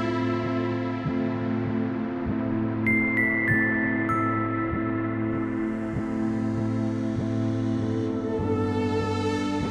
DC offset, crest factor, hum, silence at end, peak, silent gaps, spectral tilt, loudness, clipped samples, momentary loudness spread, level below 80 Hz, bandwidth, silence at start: under 0.1%; 16 dB; none; 0 s; -10 dBFS; none; -7.5 dB/octave; -26 LUFS; under 0.1%; 6 LU; -48 dBFS; 10.5 kHz; 0 s